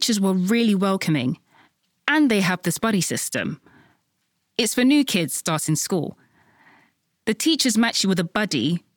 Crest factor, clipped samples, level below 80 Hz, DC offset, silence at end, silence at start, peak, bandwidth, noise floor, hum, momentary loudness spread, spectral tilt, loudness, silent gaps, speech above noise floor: 18 dB; under 0.1%; -64 dBFS; under 0.1%; 0.2 s; 0 s; -4 dBFS; 19 kHz; -72 dBFS; none; 10 LU; -4 dB/octave; -21 LUFS; none; 51 dB